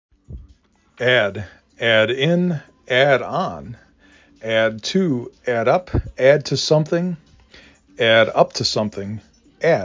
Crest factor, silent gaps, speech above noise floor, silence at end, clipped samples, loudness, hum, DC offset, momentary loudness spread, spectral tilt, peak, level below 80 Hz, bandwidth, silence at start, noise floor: 18 dB; none; 36 dB; 0 s; under 0.1%; -18 LUFS; none; under 0.1%; 15 LU; -5 dB/octave; 0 dBFS; -42 dBFS; 7.6 kHz; 0.3 s; -55 dBFS